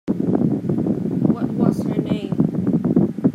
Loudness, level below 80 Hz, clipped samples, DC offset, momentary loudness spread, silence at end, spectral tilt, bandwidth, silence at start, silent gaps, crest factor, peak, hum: -20 LUFS; -52 dBFS; under 0.1%; under 0.1%; 4 LU; 0 s; -10 dB/octave; 11 kHz; 0.05 s; none; 18 dB; -2 dBFS; none